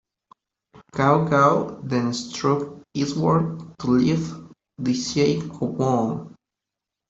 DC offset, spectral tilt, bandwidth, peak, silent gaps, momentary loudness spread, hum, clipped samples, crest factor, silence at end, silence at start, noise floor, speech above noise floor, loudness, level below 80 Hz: under 0.1%; -6.5 dB/octave; 8 kHz; -4 dBFS; none; 12 LU; none; under 0.1%; 20 dB; 0.75 s; 0.75 s; -86 dBFS; 64 dB; -22 LUFS; -56 dBFS